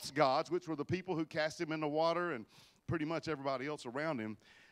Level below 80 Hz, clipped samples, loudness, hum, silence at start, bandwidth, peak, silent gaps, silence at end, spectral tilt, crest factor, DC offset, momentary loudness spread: -70 dBFS; under 0.1%; -37 LUFS; none; 0 s; 15.5 kHz; -16 dBFS; none; 0.35 s; -5.5 dB/octave; 22 dB; under 0.1%; 12 LU